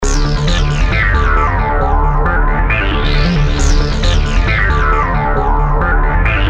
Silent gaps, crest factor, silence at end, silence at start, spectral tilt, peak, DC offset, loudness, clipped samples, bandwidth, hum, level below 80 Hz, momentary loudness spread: none; 12 dB; 0 s; 0 s; -5 dB/octave; 0 dBFS; under 0.1%; -14 LUFS; under 0.1%; 8.4 kHz; none; -14 dBFS; 2 LU